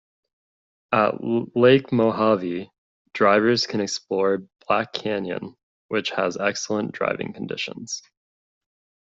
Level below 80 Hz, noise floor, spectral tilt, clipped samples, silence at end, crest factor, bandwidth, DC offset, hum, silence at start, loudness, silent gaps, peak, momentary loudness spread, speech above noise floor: -64 dBFS; under -90 dBFS; -5 dB/octave; under 0.1%; 1 s; 20 dB; 7.8 kHz; under 0.1%; none; 0.9 s; -23 LUFS; 2.78-3.05 s, 5.63-5.89 s; -4 dBFS; 13 LU; over 68 dB